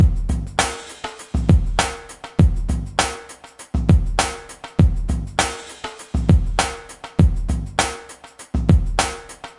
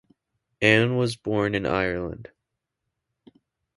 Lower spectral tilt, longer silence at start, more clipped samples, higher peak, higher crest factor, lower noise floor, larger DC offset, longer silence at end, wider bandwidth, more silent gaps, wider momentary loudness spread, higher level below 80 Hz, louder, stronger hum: about the same, -5 dB/octave vs -6 dB/octave; second, 0 s vs 0.6 s; neither; about the same, -2 dBFS vs -2 dBFS; second, 18 dB vs 24 dB; second, -41 dBFS vs -82 dBFS; neither; second, 0.1 s vs 1.55 s; about the same, 11.5 kHz vs 11.5 kHz; neither; about the same, 16 LU vs 14 LU; first, -24 dBFS vs -52 dBFS; about the same, -21 LUFS vs -23 LUFS; neither